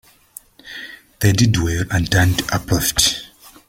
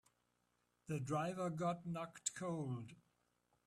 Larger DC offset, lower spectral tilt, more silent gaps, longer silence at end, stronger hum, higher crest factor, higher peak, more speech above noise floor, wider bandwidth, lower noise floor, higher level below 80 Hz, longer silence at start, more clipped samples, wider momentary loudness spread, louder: neither; second, -4 dB/octave vs -5.5 dB/octave; neither; second, 0.45 s vs 0.65 s; second, none vs 60 Hz at -65 dBFS; about the same, 18 dB vs 22 dB; first, 0 dBFS vs -22 dBFS; second, 27 dB vs 40 dB; first, 16.5 kHz vs 14 kHz; second, -44 dBFS vs -83 dBFS; first, -36 dBFS vs -78 dBFS; second, 0.65 s vs 0.9 s; neither; first, 19 LU vs 8 LU; first, -17 LUFS vs -44 LUFS